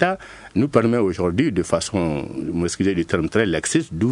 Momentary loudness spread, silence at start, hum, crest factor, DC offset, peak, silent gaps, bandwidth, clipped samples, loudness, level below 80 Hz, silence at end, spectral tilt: 7 LU; 0 s; none; 18 dB; under 0.1%; -2 dBFS; none; 11 kHz; under 0.1%; -21 LUFS; -48 dBFS; 0 s; -5.5 dB/octave